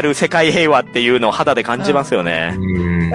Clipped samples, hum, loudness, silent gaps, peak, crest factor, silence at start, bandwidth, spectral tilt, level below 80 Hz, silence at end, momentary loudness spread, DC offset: under 0.1%; none; -15 LUFS; none; -2 dBFS; 14 dB; 0 s; 11.5 kHz; -5 dB/octave; -44 dBFS; 0 s; 5 LU; under 0.1%